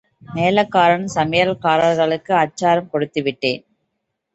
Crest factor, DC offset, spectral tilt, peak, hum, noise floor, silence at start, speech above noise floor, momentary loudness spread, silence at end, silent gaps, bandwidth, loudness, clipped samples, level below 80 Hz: 16 dB; under 0.1%; -5.5 dB/octave; -2 dBFS; none; -75 dBFS; 0.3 s; 58 dB; 7 LU; 0.75 s; none; 8.2 kHz; -17 LUFS; under 0.1%; -56 dBFS